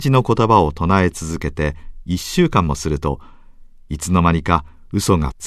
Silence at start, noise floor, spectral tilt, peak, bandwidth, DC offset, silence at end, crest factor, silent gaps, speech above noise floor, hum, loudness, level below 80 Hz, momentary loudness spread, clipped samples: 0 s; -41 dBFS; -6 dB/octave; 0 dBFS; 14 kHz; under 0.1%; 0 s; 18 dB; none; 24 dB; none; -18 LUFS; -32 dBFS; 11 LU; under 0.1%